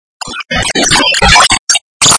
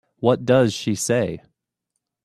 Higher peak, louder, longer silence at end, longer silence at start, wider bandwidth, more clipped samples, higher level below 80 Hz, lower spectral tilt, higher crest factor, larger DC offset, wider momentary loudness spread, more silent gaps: about the same, 0 dBFS vs -2 dBFS; first, -7 LUFS vs -20 LUFS; second, 0 s vs 0.85 s; about the same, 0.2 s vs 0.2 s; second, 11 kHz vs 13.5 kHz; first, 1% vs under 0.1%; first, -26 dBFS vs -58 dBFS; second, -1 dB/octave vs -5 dB/octave; second, 10 dB vs 20 dB; neither; first, 13 LU vs 9 LU; first, 1.59-1.67 s, 1.81-2.00 s vs none